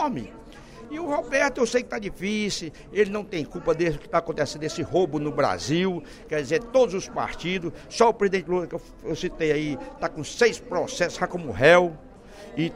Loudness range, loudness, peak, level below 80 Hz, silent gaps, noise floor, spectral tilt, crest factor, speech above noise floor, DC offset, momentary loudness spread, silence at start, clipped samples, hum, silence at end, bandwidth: 3 LU; -25 LUFS; -4 dBFS; -48 dBFS; none; -44 dBFS; -5 dB/octave; 20 dB; 19 dB; under 0.1%; 12 LU; 0 s; under 0.1%; none; 0 s; 14.5 kHz